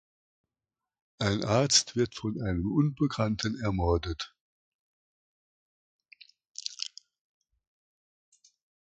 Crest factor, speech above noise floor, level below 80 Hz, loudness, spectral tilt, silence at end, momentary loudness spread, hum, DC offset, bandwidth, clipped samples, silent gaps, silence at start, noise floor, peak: 24 dB; over 62 dB; -48 dBFS; -29 LUFS; -4.5 dB/octave; 2 s; 15 LU; none; under 0.1%; 9.4 kHz; under 0.1%; 4.41-5.99 s, 6.47-6.55 s; 1.2 s; under -90 dBFS; -8 dBFS